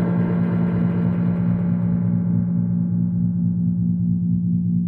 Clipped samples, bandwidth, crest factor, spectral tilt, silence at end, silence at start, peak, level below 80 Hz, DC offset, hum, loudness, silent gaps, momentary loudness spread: under 0.1%; 2.6 kHz; 10 dB; -13 dB/octave; 0 s; 0 s; -10 dBFS; -44 dBFS; under 0.1%; none; -21 LUFS; none; 1 LU